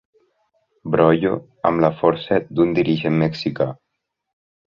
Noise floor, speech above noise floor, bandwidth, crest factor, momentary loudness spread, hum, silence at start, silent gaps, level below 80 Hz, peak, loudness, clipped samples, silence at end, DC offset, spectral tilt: -66 dBFS; 48 dB; 7 kHz; 18 dB; 7 LU; none; 0.85 s; none; -52 dBFS; -2 dBFS; -19 LUFS; under 0.1%; 0.95 s; under 0.1%; -8.5 dB/octave